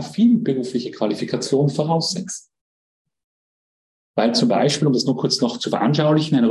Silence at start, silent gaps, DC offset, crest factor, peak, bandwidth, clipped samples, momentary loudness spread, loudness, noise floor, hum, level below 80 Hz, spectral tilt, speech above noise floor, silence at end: 0 s; 2.61-3.05 s, 3.24-4.14 s; under 0.1%; 14 dB; -6 dBFS; 11.5 kHz; under 0.1%; 8 LU; -19 LUFS; under -90 dBFS; none; -64 dBFS; -5.5 dB/octave; over 71 dB; 0 s